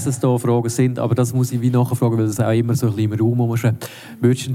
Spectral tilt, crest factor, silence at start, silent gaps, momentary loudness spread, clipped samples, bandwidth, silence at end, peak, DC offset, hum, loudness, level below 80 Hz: -7 dB/octave; 14 dB; 0 s; none; 3 LU; under 0.1%; 15.5 kHz; 0 s; -2 dBFS; under 0.1%; none; -19 LUFS; -60 dBFS